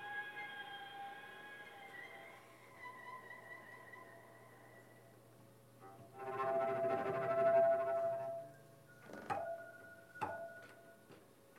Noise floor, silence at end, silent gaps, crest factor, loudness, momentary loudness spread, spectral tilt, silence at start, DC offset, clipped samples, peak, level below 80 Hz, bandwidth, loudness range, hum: -63 dBFS; 0 s; none; 20 dB; -41 LUFS; 25 LU; -5.5 dB/octave; 0 s; under 0.1%; under 0.1%; -24 dBFS; -86 dBFS; 15.5 kHz; 18 LU; none